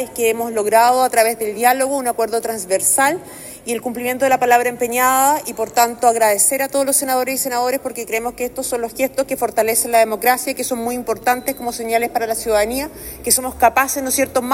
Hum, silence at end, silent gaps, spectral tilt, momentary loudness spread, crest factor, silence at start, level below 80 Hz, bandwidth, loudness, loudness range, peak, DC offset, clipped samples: none; 0 s; none; -2 dB/octave; 9 LU; 18 dB; 0 s; -48 dBFS; 16.5 kHz; -17 LUFS; 3 LU; 0 dBFS; under 0.1%; under 0.1%